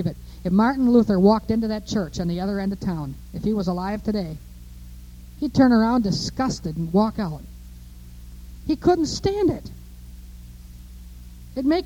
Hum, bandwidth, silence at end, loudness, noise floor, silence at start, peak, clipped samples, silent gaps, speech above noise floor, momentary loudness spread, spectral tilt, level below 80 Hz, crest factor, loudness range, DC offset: 60 Hz at -40 dBFS; 17 kHz; 0 s; -22 LUFS; -41 dBFS; 0 s; -4 dBFS; under 0.1%; none; 20 dB; 26 LU; -6.5 dB/octave; -40 dBFS; 18 dB; 5 LU; under 0.1%